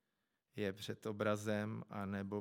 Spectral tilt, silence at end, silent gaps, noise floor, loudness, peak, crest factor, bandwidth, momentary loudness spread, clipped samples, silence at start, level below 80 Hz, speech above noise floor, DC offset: -6 dB/octave; 0 s; none; -87 dBFS; -42 LUFS; -22 dBFS; 20 dB; 17 kHz; 7 LU; under 0.1%; 0.55 s; -88 dBFS; 46 dB; under 0.1%